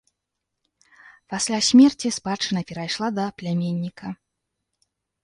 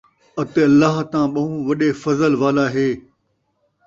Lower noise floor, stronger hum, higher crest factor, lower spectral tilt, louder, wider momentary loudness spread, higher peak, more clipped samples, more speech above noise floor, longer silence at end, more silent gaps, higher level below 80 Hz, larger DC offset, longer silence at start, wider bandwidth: first, -81 dBFS vs -68 dBFS; neither; about the same, 20 dB vs 16 dB; second, -4.5 dB/octave vs -7 dB/octave; second, -22 LUFS vs -18 LUFS; first, 18 LU vs 9 LU; about the same, -4 dBFS vs -2 dBFS; neither; first, 60 dB vs 51 dB; first, 1.1 s vs 0.85 s; neither; second, -62 dBFS vs -56 dBFS; neither; first, 1.3 s vs 0.35 s; first, 11.5 kHz vs 7.6 kHz